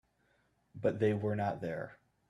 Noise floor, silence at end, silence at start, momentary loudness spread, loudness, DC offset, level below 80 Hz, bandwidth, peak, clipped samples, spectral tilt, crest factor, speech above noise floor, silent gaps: -74 dBFS; 0.35 s; 0.75 s; 11 LU; -35 LUFS; under 0.1%; -72 dBFS; 11 kHz; -18 dBFS; under 0.1%; -8.5 dB/octave; 18 dB; 40 dB; none